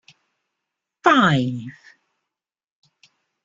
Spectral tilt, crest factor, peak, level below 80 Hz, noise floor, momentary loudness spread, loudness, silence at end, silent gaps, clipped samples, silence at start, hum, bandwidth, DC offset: -6 dB/octave; 22 dB; -2 dBFS; -60 dBFS; -85 dBFS; 19 LU; -18 LUFS; 1.75 s; none; under 0.1%; 1.05 s; none; 7.6 kHz; under 0.1%